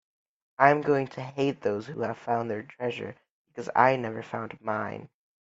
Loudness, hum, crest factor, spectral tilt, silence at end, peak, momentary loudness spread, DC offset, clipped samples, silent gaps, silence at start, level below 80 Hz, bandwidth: -28 LUFS; none; 26 dB; -7 dB/octave; 0.35 s; -4 dBFS; 16 LU; under 0.1%; under 0.1%; 3.31-3.45 s; 0.6 s; -72 dBFS; 8 kHz